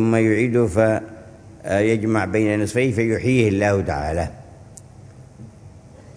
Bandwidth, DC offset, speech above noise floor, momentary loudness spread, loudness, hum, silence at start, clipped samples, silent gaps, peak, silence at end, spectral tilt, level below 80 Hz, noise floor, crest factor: 11 kHz; under 0.1%; 25 dB; 8 LU; -20 LUFS; none; 0 s; under 0.1%; none; -2 dBFS; 0.15 s; -7 dB/octave; -42 dBFS; -43 dBFS; 18 dB